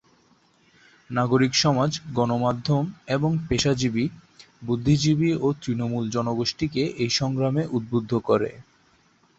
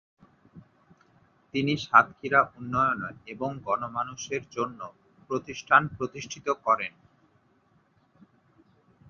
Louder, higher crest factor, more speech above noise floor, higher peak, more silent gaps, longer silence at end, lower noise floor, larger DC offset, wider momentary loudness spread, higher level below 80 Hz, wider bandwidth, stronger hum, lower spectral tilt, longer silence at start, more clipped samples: first, -24 LUFS vs -27 LUFS; second, 18 dB vs 26 dB; about the same, 38 dB vs 38 dB; second, -8 dBFS vs -4 dBFS; neither; second, 0.75 s vs 2.2 s; second, -61 dBFS vs -65 dBFS; neither; second, 7 LU vs 14 LU; first, -50 dBFS vs -64 dBFS; first, 8 kHz vs 7.2 kHz; neither; about the same, -5.5 dB/octave vs -4.5 dB/octave; first, 1.1 s vs 0.55 s; neither